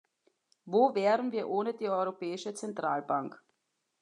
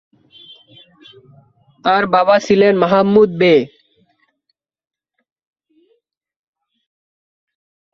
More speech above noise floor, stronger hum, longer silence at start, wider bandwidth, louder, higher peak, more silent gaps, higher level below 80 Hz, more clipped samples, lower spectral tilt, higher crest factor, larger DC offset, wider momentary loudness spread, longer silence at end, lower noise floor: second, 50 dB vs 58 dB; neither; second, 0.65 s vs 1.85 s; first, 10.5 kHz vs 7.2 kHz; second, -31 LUFS vs -13 LUFS; second, -14 dBFS vs 0 dBFS; neither; second, under -90 dBFS vs -58 dBFS; neither; about the same, -5.5 dB/octave vs -6.5 dB/octave; about the same, 20 dB vs 18 dB; neither; first, 11 LU vs 5 LU; second, 0.65 s vs 4.3 s; first, -81 dBFS vs -72 dBFS